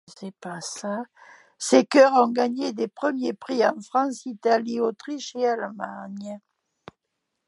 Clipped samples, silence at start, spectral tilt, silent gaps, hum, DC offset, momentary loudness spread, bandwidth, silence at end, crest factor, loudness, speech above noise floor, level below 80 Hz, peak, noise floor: under 0.1%; 0.1 s; -4 dB/octave; none; none; under 0.1%; 19 LU; 11.5 kHz; 1.1 s; 22 dB; -23 LUFS; 56 dB; -78 dBFS; -4 dBFS; -80 dBFS